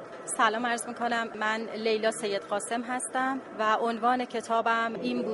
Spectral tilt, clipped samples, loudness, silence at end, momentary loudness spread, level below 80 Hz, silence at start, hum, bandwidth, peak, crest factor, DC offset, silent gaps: -2.5 dB/octave; under 0.1%; -29 LUFS; 0 s; 5 LU; -76 dBFS; 0 s; none; 11.5 kHz; -10 dBFS; 20 dB; under 0.1%; none